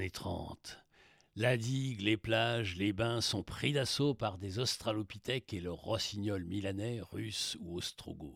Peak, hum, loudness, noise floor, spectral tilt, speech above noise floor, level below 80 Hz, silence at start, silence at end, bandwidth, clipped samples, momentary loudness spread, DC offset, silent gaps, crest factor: -16 dBFS; none; -36 LUFS; -66 dBFS; -4.5 dB/octave; 30 dB; -62 dBFS; 0 s; 0 s; 16 kHz; under 0.1%; 10 LU; under 0.1%; none; 20 dB